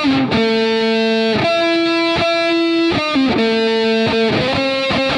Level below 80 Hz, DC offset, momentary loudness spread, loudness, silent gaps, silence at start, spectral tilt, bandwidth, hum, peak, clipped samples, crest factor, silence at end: -46 dBFS; under 0.1%; 1 LU; -15 LUFS; none; 0 s; -5 dB/octave; 10.5 kHz; none; -4 dBFS; under 0.1%; 12 dB; 0 s